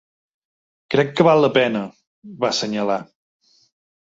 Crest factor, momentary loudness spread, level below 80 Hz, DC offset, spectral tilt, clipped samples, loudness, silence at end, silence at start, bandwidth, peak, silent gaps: 20 dB; 12 LU; -64 dBFS; under 0.1%; -5 dB/octave; under 0.1%; -19 LUFS; 1 s; 0.9 s; 7.8 kHz; -2 dBFS; 2.07-2.22 s